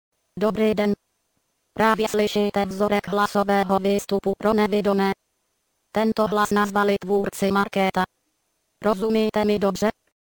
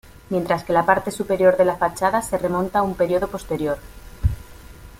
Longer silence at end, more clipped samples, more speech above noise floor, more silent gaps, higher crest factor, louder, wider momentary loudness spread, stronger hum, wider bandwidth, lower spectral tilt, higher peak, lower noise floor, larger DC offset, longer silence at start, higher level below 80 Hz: first, 0.3 s vs 0.05 s; neither; first, 51 dB vs 21 dB; neither; about the same, 18 dB vs 20 dB; about the same, -22 LUFS vs -21 LUFS; second, 6 LU vs 9 LU; neither; first, 19 kHz vs 16.5 kHz; about the same, -5.5 dB/octave vs -6 dB/octave; about the same, -4 dBFS vs -2 dBFS; first, -72 dBFS vs -41 dBFS; neither; about the same, 0.35 s vs 0.3 s; second, -52 dBFS vs -38 dBFS